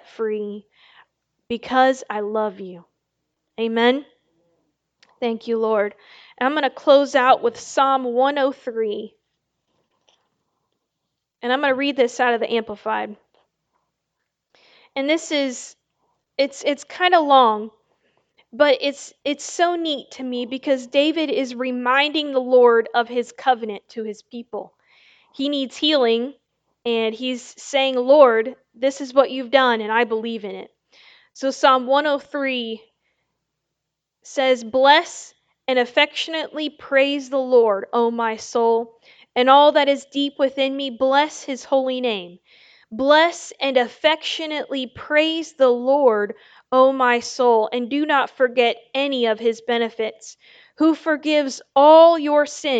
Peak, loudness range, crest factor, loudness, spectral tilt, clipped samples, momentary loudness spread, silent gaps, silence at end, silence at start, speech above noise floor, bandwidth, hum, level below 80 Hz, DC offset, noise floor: 0 dBFS; 6 LU; 20 dB; -19 LUFS; -3 dB/octave; under 0.1%; 14 LU; none; 0 s; 0.2 s; 62 dB; 9 kHz; none; -70 dBFS; under 0.1%; -81 dBFS